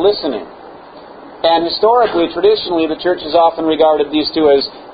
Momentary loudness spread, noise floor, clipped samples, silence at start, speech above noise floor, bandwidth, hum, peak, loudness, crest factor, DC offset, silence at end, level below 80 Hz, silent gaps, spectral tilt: 6 LU; -35 dBFS; under 0.1%; 0 s; 22 dB; 5 kHz; none; 0 dBFS; -14 LUFS; 14 dB; under 0.1%; 0 s; -48 dBFS; none; -10 dB/octave